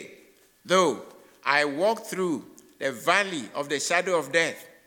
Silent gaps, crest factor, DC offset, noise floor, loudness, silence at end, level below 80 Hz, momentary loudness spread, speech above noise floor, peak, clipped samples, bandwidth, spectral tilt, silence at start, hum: none; 20 dB; under 0.1%; -57 dBFS; -25 LUFS; 0.2 s; -78 dBFS; 10 LU; 32 dB; -6 dBFS; under 0.1%; 19 kHz; -3 dB/octave; 0 s; none